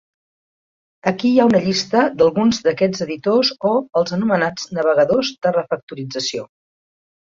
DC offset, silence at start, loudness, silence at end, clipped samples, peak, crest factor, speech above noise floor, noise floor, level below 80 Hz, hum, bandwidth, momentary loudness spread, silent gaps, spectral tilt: under 0.1%; 1.05 s; -18 LUFS; 0.9 s; under 0.1%; -2 dBFS; 16 dB; over 73 dB; under -90 dBFS; -58 dBFS; none; 7.6 kHz; 9 LU; 5.83-5.87 s; -5 dB/octave